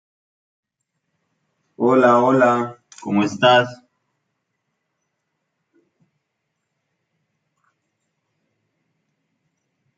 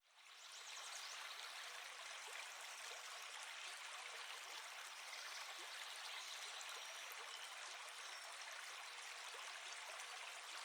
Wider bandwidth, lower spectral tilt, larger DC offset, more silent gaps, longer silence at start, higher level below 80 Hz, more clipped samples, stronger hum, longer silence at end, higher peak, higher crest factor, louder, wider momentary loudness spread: second, 7.8 kHz vs over 20 kHz; first, -5.5 dB/octave vs 4.5 dB/octave; neither; neither; first, 1.8 s vs 0.05 s; first, -72 dBFS vs under -90 dBFS; neither; neither; first, 6.25 s vs 0 s; first, -2 dBFS vs -36 dBFS; about the same, 22 dB vs 18 dB; first, -16 LUFS vs -51 LUFS; first, 14 LU vs 2 LU